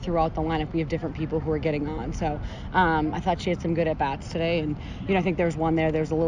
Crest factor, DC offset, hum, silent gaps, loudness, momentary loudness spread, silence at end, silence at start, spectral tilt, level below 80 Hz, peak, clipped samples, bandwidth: 16 dB; under 0.1%; none; none; -26 LUFS; 6 LU; 0 s; 0 s; -7 dB/octave; -38 dBFS; -10 dBFS; under 0.1%; 9.4 kHz